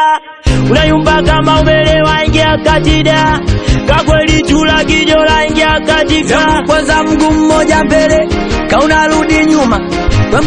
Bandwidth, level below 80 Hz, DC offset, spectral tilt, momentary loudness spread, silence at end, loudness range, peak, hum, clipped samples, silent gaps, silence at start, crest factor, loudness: 10 kHz; -18 dBFS; under 0.1%; -5 dB/octave; 4 LU; 0 s; 0 LU; 0 dBFS; none; under 0.1%; none; 0 s; 8 dB; -9 LUFS